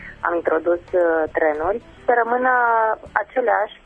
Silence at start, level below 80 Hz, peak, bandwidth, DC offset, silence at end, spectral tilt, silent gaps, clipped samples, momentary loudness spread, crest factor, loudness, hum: 0 s; -50 dBFS; 0 dBFS; 3.8 kHz; under 0.1%; 0.15 s; -7 dB/octave; none; under 0.1%; 7 LU; 20 dB; -20 LUFS; none